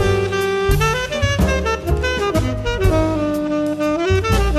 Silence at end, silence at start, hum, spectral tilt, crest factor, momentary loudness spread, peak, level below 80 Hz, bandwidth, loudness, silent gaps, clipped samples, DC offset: 0 s; 0 s; none; -5.5 dB/octave; 14 dB; 3 LU; -4 dBFS; -24 dBFS; 14 kHz; -18 LUFS; none; under 0.1%; under 0.1%